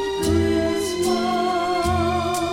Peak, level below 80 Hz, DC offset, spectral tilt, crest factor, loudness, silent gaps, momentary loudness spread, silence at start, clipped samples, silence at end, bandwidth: -8 dBFS; -40 dBFS; under 0.1%; -5 dB/octave; 12 dB; -21 LUFS; none; 3 LU; 0 s; under 0.1%; 0 s; 17 kHz